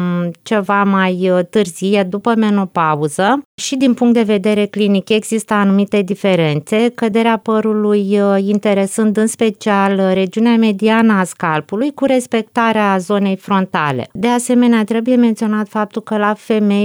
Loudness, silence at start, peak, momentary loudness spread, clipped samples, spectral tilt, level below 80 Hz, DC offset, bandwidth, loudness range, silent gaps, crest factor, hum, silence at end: -14 LUFS; 0 s; -2 dBFS; 5 LU; under 0.1%; -5.5 dB/octave; -62 dBFS; under 0.1%; over 20 kHz; 1 LU; 3.45-3.58 s; 10 dB; none; 0 s